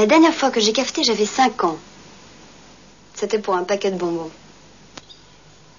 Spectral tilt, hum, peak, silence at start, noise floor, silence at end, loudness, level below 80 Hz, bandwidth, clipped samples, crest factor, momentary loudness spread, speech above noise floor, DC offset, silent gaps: -3 dB/octave; none; -4 dBFS; 0 s; -49 dBFS; 1.5 s; -19 LUFS; -60 dBFS; 7.4 kHz; under 0.1%; 18 dB; 20 LU; 30 dB; 0.2%; none